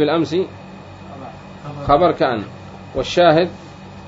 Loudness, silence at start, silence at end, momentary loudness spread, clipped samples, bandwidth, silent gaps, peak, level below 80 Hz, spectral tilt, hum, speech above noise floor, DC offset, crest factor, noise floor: -17 LUFS; 0 s; 0 s; 23 LU; under 0.1%; 7.8 kHz; none; -2 dBFS; -44 dBFS; -6 dB/octave; none; 20 dB; under 0.1%; 18 dB; -36 dBFS